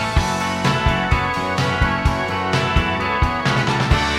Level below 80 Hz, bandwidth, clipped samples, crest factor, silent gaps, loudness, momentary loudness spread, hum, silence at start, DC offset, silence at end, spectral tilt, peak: -26 dBFS; 15 kHz; under 0.1%; 16 dB; none; -19 LUFS; 2 LU; none; 0 s; under 0.1%; 0 s; -5 dB/octave; -2 dBFS